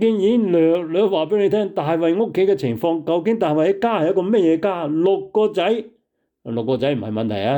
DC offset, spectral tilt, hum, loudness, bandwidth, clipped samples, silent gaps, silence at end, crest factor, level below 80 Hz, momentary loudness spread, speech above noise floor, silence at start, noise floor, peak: under 0.1%; -8 dB/octave; none; -19 LUFS; 19.5 kHz; under 0.1%; none; 0 s; 10 dB; -64 dBFS; 5 LU; 39 dB; 0 s; -57 dBFS; -8 dBFS